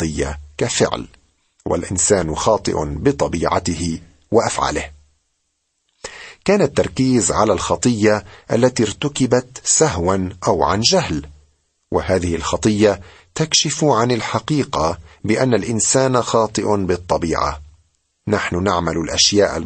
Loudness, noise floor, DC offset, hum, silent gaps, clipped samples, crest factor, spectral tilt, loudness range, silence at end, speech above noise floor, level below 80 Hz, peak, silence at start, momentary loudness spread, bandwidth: -18 LUFS; -70 dBFS; under 0.1%; none; none; under 0.1%; 18 dB; -4 dB/octave; 3 LU; 0 s; 53 dB; -38 dBFS; -2 dBFS; 0 s; 10 LU; 9 kHz